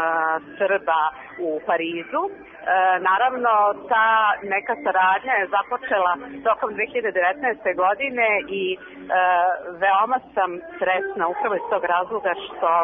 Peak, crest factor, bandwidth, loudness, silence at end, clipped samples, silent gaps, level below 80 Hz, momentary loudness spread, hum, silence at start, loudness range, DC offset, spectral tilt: -6 dBFS; 16 dB; 3.8 kHz; -21 LUFS; 0 s; under 0.1%; none; -64 dBFS; 8 LU; none; 0 s; 3 LU; under 0.1%; -7.5 dB/octave